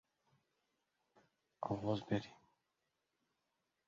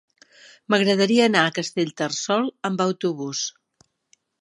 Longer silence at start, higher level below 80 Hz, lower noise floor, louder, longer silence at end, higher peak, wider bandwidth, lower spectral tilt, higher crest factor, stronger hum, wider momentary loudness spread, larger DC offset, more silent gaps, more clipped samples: first, 1.6 s vs 0.7 s; about the same, -74 dBFS vs -74 dBFS; first, -87 dBFS vs -64 dBFS; second, -42 LUFS vs -22 LUFS; first, 1.55 s vs 0.9 s; second, -24 dBFS vs -2 dBFS; second, 7.4 kHz vs 11.5 kHz; first, -6 dB/octave vs -4 dB/octave; about the same, 22 dB vs 22 dB; neither; about the same, 10 LU vs 9 LU; neither; neither; neither